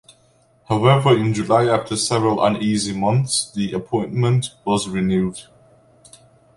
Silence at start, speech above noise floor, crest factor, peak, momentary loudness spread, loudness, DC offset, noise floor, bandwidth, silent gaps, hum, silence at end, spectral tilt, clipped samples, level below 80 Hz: 0.7 s; 38 dB; 18 dB; -2 dBFS; 8 LU; -19 LUFS; under 0.1%; -57 dBFS; 11.5 kHz; none; none; 1.15 s; -5.5 dB/octave; under 0.1%; -50 dBFS